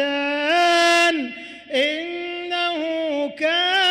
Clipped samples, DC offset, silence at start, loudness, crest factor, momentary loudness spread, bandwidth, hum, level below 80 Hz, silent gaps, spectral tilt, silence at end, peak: under 0.1%; under 0.1%; 0 s; -20 LUFS; 12 dB; 12 LU; 16 kHz; none; -66 dBFS; none; -1 dB/octave; 0 s; -10 dBFS